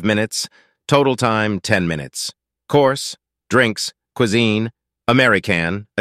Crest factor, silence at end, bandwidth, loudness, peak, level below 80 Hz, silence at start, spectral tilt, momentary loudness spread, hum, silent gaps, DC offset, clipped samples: 18 dB; 0 s; 15.5 kHz; -18 LUFS; 0 dBFS; -52 dBFS; 0 s; -4.5 dB/octave; 12 LU; none; none; under 0.1%; under 0.1%